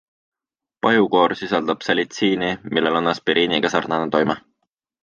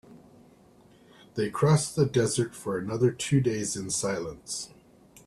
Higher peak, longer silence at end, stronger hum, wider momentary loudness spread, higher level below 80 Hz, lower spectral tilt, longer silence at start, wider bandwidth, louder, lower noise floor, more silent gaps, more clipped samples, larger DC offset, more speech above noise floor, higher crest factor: first, -2 dBFS vs -10 dBFS; about the same, 0.65 s vs 0.6 s; neither; second, 5 LU vs 12 LU; about the same, -58 dBFS vs -60 dBFS; about the same, -5 dB/octave vs -5 dB/octave; first, 0.85 s vs 0.1 s; second, 7.4 kHz vs 13.5 kHz; first, -19 LUFS vs -27 LUFS; first, -88 dBFS vs -57 dBFS; neither; neither; neither; first, 68 dB vs 30 dB; about the same, 18 dB vs 18 dB